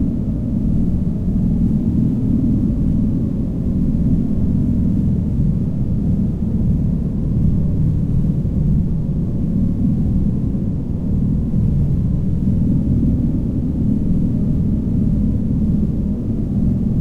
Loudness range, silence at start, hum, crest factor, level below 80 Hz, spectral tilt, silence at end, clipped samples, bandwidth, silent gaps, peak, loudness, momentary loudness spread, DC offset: 1 LU; 0 s; none; 12 dB; -24 dBFS; -11.5 dB/octave; 0 s; under 0.1%; 4.2 kHz; none; -4 dBFS; -18 LUFS; 3 LU; under 0.1%